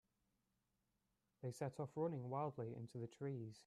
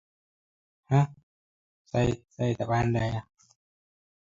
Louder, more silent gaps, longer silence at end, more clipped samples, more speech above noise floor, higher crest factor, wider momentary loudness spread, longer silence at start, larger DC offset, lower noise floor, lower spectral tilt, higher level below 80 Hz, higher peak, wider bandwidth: second, -48 LUFS vs -28 LUFS; second, none vs 1.23-1.85 s; second, 0.05 s vs 1.05 s; neither; second, 40 dB vs over 64 dB; about the same, 18 dB vs 20 dB; about the same, 8 LU vs 7 LU; first, 1.4 s vs 0.9 s; neither; about the same, -87 dBFS vs under -90 dBFS; about the same, -8 dB/octave vs -7.5 dB/octave; second, -84 dBFS vs -52 dBFS; second, -32 dBFS vs -10 dBFS; first, 13 kHz vs 7.6 kHz